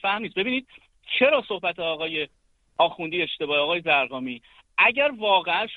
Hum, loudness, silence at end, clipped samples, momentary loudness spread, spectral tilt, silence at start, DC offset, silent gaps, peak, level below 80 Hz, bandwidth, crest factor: none; -23 LUFS; 0 s; under 0.1%; 11 LU; -6 dB/octave; 0.05 s; under 0.1%; none; -6 dBFS; -66 dBFS; 4.7 kHz; 18 dB